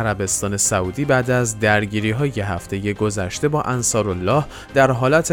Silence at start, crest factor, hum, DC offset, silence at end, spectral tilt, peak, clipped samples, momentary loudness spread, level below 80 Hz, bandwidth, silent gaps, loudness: 0 s; 16 dB; none; under 0.1%; 0 s; -4.5 dB/octave; -2 dBFS; under 0.1%; 5 LU; -42 dBFS; 19 kHz; none; -19 LUFS